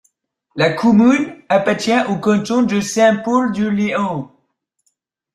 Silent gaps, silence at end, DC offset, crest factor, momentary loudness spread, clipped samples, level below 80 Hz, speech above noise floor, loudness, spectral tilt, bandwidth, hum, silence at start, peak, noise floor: none; 1.1 s; under 0.1%; 16 dB; 8 LU; under 0.1%; -56 dBFS; 53 dB; -16 LUFS; -5.5 dB/octave; 12.5 kHz; none; 0.55 s; -2 dBFS; -68 dBFS